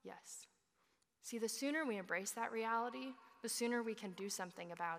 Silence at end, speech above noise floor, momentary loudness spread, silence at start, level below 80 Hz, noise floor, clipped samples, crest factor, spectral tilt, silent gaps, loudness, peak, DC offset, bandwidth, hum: 0 s; 38 dB; 13 LU; 0.05 s; under -90 dBFS; -81 dBFS; under 0.1%; 18 dB; -2.5 dB/octave; none; -43 LUFS; -26 dBFS; under 0.1%; 15.5 kHz; none